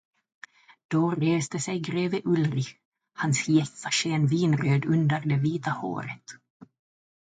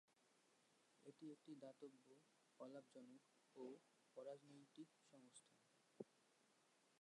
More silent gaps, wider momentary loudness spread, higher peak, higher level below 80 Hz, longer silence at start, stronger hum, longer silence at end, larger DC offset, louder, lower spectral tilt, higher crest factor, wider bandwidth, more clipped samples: first, 2.85-2.92 s, 6.50-6.60 s vs none; first, 11 LU vs 8 LU; first, -10 dBFS vs -38 dBFS; first, -68 dBFS vs under -90 dBFS; first, 0.9 s vs 0.1 s; neither; first, 0.75 s vs 0 s; neither; first, -26 LUFS vs -63 LUFS; about the same, -5.5 dB/octave vs -5 dB/octave; second, 16 dB vs 26 dB; second, 9.6 kHz vs 11 kHz; neither